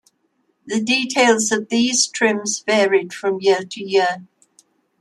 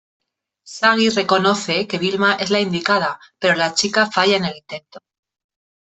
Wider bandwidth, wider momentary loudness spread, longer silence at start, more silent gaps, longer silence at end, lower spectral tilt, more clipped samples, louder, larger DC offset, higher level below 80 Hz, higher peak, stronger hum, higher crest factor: first, 12.5 kHz vs 8.4 kHz; about the same, 8 LU vs 10 LU; about the same, 0.65 s vs 0.65 s; neither; second, 0.75 s vs 0.9 s; second, -2 dB/octave vs -3.5 dB/octave; neither; about the same, -18 LUFS vs -17 LUFS; neither; second, -68 dBFS vs -62 dBFS; about the same, -2 dBFS vs -2 dBFS; neither; about the same, 18 dB vs 18 dB